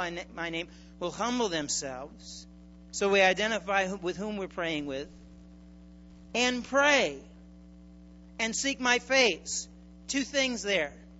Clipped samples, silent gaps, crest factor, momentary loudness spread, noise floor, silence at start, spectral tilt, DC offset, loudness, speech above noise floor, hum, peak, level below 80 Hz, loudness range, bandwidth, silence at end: under 0.1%; none; 22 dB; 20 LU; -51 dBFS; 0 s; -2.5 dB/octave; under 0.1%; -28 LUFS; 22 dB; none; -8 dBFS; -56 dBFS; 4 LU; 8.2 kHz; 0 s